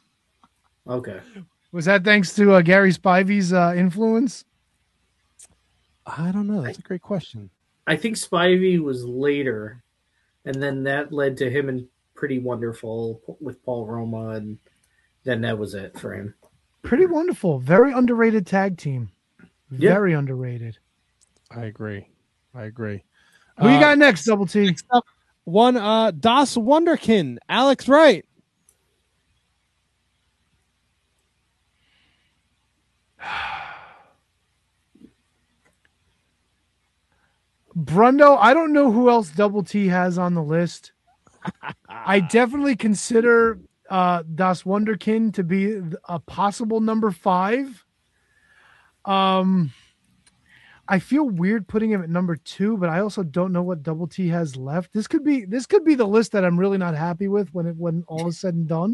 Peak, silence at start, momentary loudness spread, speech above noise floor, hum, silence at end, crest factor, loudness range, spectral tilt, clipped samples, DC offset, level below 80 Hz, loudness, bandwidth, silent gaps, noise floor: 0 dBFS; 0.85 s; 18 LU; 50 dB; none; 0 s; 20 dB; 13 LU; -6 dB/octave; under 0.1%; under 0.1%; -60 dBFS; -20 LUFS; 12 kHz; none; -70 dBFS